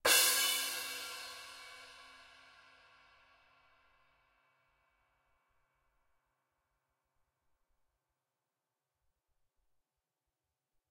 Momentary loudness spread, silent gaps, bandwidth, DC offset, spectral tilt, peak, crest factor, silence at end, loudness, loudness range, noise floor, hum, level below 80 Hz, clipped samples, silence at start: 27 LU; none; 16.5 kHz; under 0.1%; 2 dB/octave; -14 dBFS; 28 dB; 8.75 s; -31 LUFS; 27 LU; under -90 dBFS; none; -80 dBFS; under 0.1%; 0.05 s